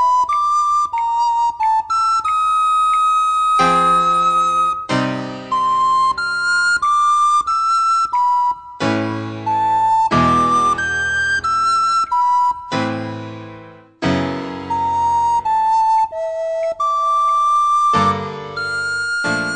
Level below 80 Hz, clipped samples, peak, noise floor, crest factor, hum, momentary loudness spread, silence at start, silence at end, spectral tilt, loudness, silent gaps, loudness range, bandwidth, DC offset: -50 dBFS; under 0.1%; -2 dBFS; -39 dBFS; 14 dB; none; 9 LU; 0 s; 0 s; -4 dB/octave; -16 LUFS; none; 4 LU; 9.4 kHz; 0.3%